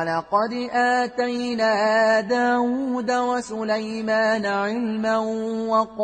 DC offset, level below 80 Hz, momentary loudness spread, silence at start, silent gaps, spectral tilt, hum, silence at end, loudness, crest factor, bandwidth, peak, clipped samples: under 0.1%; -62 dBFS; 6 LU; 0 s; none; -4.5 dB/octave; none; 0 s; -22 LUFS; 14 dB; 9.4 kHz; -8 dBFS; under 0.1%